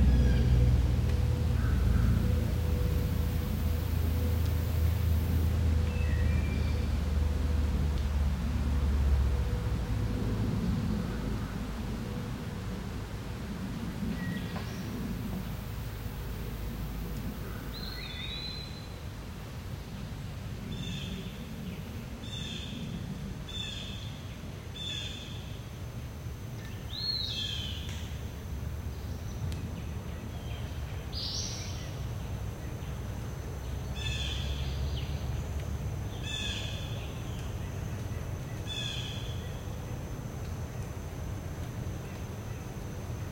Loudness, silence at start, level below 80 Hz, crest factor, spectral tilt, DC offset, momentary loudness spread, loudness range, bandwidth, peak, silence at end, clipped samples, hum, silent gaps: -34 LUFS; 0 s; -36 dBFS; 18 dB; -6 dB/octave; under 0.1%; 11 LU; 9 LU; 16.5 kHz; -14 dBFS; 0 s; under 0.1%; none; none